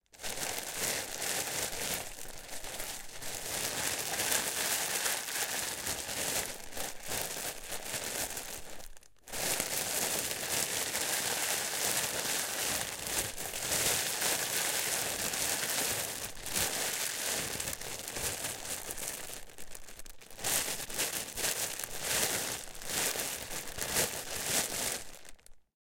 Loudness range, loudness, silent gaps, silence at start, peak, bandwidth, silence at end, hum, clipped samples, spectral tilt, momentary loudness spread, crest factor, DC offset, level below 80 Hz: 5 LU; -33 LUFS; none; 0.15 s; -8 dBFS; 17 kHz; 0.25 s; none; under 0.1%; -0.5 dB/octave; 10 LU; 28 dB; under 0.1%; -56 dBFS